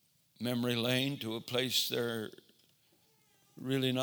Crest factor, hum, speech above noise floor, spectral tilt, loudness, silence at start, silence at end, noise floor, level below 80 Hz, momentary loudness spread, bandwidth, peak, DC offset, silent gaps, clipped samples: 20 dB; none; 36 dB; -4 dB/octave; -34 LUFS; 0.4 s; 0 s; -70 dBFS; -80 dBFS; 10 LU; over 20 kHz; -16 dBFS; under 0.1%; none; under 0.1%